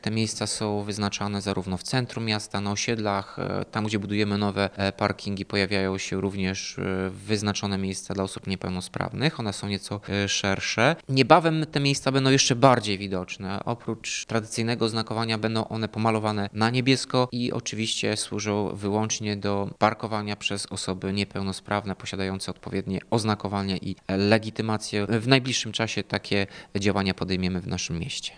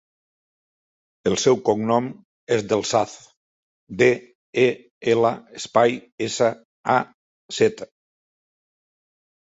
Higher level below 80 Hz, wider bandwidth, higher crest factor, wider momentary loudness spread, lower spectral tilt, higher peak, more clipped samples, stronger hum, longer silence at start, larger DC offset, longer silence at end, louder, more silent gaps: about the same, -58 dBFS vs -62 dBFS; first, 10.5 kHz vs 8 kHz; about the same, 24 dB vs 20 dB; second, 9 LU vs 14 LU; about the same, -4.5 dB/octave vs -4.5 dB/octave; about the same, -2 dBFS vs -2 dBFS; neither; neither; second, 0 s vs 1.25 s; neither; second, 0 s vs 1.7 s; second, -26 LUFS vs -22 LUFS; second, none vs 2.25-2.47 s, 3.37-3.87 s, 4.35-4.53 s, 4.91-5.01 s, 6.12-6.18 s, 6.65-6.84 s, 7.14-7.49 s